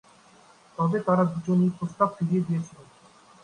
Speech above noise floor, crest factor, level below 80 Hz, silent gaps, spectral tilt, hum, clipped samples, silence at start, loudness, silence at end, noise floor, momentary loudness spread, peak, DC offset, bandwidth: 31 dB; 20 dB; -66 dBFS; none; -9 dB/octave; none; under 0.1%; 0.8 s; -25 LUFS; 0.6 s; -55 dBFS; 8 LU; -8 dBFS; under 0.1%; 9.8 kHz